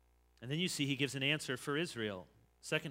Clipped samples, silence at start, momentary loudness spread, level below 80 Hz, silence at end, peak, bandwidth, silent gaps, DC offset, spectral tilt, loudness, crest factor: under 0.1%; 0.4 s; 13 LU; -72 dBFS; 0 s; -18 dBFS; 16 kHz; none; under 0.1%; -4 dB/octave; -37 LUFS; 22 dB